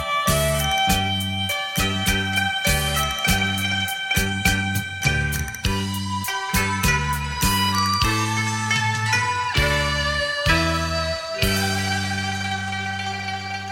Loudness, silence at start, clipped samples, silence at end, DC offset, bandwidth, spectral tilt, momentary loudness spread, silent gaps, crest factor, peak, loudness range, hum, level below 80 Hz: -21 LUFS; 0 s; under 0.1%; 0 s; under 0.1%; 17.5 kHz; -3.5 dB/octave; 6 LU; none; 18 dB; -4 dBFS; 2 LU; none; -34 dBFS